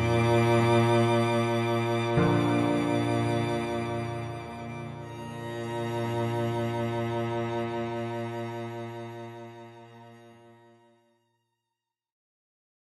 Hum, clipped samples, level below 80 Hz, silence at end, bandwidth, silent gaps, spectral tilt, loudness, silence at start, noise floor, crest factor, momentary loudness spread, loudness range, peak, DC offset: none; under 0.1%; -58 dBFS; 2.65 s; 13.5 kHz; none; -7 dB/octave; -28 LUFS; 0 s; -87 dBFS; 18 dB; 16 LU; 16 LU; -12 dBFS; under 0.1%